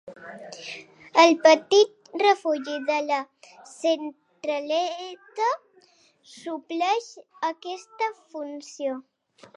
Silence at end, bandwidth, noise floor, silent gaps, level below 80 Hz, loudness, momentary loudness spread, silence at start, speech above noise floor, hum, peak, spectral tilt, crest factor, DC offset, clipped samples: 0.55 s; 10.5 kHz; -59 dBFS; none; -84 dBFS; -24 LUFS; 20 LU; 0.05 s; 35 dB; none; -4 dBFS; -2 dB/octave; 22 dB; under 0.1%; under 0.1%